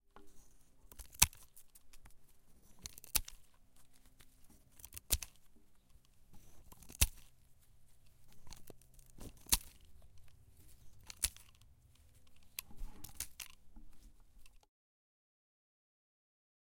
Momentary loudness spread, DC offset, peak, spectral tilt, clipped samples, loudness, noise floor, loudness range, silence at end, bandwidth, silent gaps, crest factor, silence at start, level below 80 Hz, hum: 28 LU; under 0.1%; -8 dBFS; -1 dB/octave; under 0.1%; -37 LUFS; -64 dBFS; 13 LU; 2.1 s; 17 kHz; none; 36 dB; 0.15 s; -54 dBFS; none